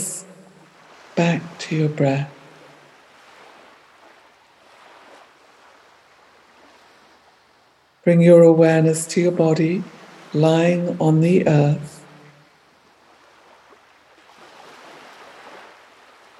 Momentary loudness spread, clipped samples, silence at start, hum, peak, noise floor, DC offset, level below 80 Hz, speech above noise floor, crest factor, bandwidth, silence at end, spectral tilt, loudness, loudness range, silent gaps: 17 LU; under 0.1%; 0 s; none; 0 dBFS; -57 dBFS; under 0.1%; -68 dBFS; 41 dB; 20 dB; 12.5 kHz; 0.85 s; -7 dB/octave; -17 LUFS; 11 LU; none